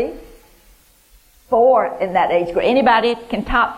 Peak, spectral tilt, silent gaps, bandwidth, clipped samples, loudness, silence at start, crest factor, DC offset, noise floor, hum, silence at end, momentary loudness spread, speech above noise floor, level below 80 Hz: -4 dBFS; -6 dB/octave; none; 15.5 kHz; under 0.1%; -16 LUFS; 0 s; 14 dB; under 0.1%; -51 dBFS; none; 0 s; 7 LU; 36 dB; -40 dBFS